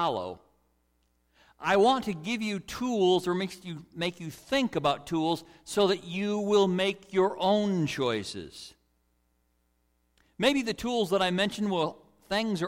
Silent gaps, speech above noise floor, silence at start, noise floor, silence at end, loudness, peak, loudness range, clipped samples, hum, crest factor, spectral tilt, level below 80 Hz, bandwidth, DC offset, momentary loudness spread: none; 44 dB; 0 s; -72 dBFS; 0 s; -28 LUFS; -12 dBFS; 4 LU; under 0.1%; none; 18 dB; -5 dB/octave; -62 dBFS; 16.5 kHz; under 0.1%; 12 LU